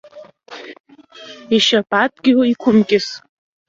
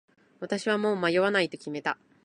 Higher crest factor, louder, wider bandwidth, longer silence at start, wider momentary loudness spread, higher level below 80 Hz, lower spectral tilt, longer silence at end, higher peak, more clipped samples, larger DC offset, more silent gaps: about the same, 16 dB vs 18 dB; first, -15 LUFS vs -27 LUFS; second, 7.8 kHz vs 11 kHz; second, 0.15 s vs 0.4 s; first, 23 LU vs 9 LU; first, -60 dBFS vs -76 dBFS; about the same, -4.5 dB/octave vs -5 dB/octave; first, 0.5 s vs 0.3 s; first, -2 dBFS vs -10 dBFS; neither; neither; first, 0.80-0.84 s vs none